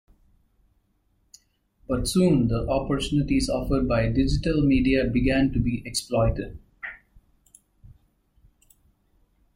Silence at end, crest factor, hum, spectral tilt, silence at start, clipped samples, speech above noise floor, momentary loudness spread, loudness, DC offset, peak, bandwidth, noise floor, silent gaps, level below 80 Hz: 2.6 s; 18 dB; none; -6 dB/octave; 1.9 s; under 0.1%; 45 dB; 12 LU; -24 LUFS; under 0.1%; -8 dBFS; 15.5 kHz; -68 dBFS; none; -36 dBFS